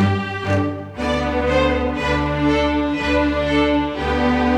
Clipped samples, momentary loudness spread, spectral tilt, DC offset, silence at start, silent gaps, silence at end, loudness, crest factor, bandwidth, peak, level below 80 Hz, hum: under 0.1%; 4 LU; -6.5 dB/octave; under 0.1%; 0 s; none; 0 s; -19 LUFS; 14 dB; 10 kHz; -6 dBFS; -30 dBFS; none